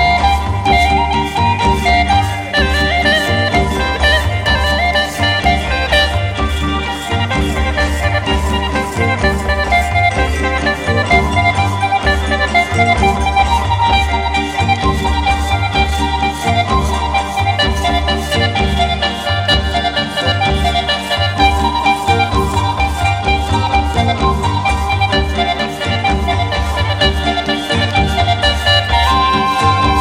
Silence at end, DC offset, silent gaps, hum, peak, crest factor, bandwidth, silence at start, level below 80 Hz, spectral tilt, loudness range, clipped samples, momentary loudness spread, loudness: 0 s; under 0.1%; none; none; 0 dBFS; 14 dB; 15.5 kHz; 0 s; -22 dBFS; -5 dB/octave; 2 LU; under 0.1%; 4 LU; -14 LUFS